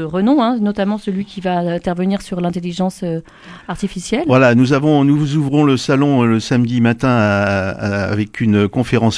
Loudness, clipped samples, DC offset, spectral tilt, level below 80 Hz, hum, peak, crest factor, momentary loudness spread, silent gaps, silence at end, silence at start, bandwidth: -16 LUFS; under 0.1%; under 0.1%; -7 dB/octave; -44 dBFS; none; 0 dBFS; 14 dB; 9 LU; none; 0 s; 0 s; 11 kHz